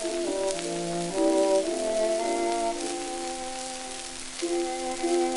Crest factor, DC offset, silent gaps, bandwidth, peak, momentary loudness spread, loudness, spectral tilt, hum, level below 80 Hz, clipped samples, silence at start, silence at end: 20 dB; under 0.1%; none; 12 kHz; -8 dBFS; 10 LU; -28 LUFS; -3 dB/octave; none; -54 dBFS; under 0.1%; 0 s; 0 s